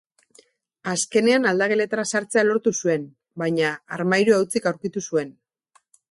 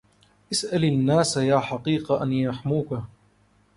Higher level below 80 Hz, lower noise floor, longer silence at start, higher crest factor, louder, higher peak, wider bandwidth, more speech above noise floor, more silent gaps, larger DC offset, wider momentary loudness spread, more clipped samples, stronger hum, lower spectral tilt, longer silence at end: second, -68 dBFS vs -56 dBFS; about the same, -63 dBFS vs -61 dBFS; first, 0.85 s vs 0.5 s; about the same, 18 dB vs 18 dB; about the same, -22 LUFS vs -24 LUFS; about the same, -6 dBFS vs -8 dBFS; about the same, 12 kHz vs 11.5 kHz; first, 42 dB vs 38 dB; neither; neither; about the same, 10 LU vs 8 LU; neither; neither; second, -4 dB/octave vs -5.5 dB/octave; about the same, 0.8 s vs 0.7 s